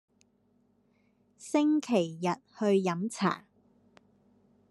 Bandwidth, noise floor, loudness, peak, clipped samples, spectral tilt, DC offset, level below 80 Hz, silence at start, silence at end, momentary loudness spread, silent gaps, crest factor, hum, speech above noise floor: 12 kHz; -70 dBFS; -30 LUFS; -12 dBFS; under 0.1%; -6 dB/octave; under 0.1%; -80 dBFS; 1.4 s; 1.3 s; 7 LU; none; 22 dB; none; 41 dB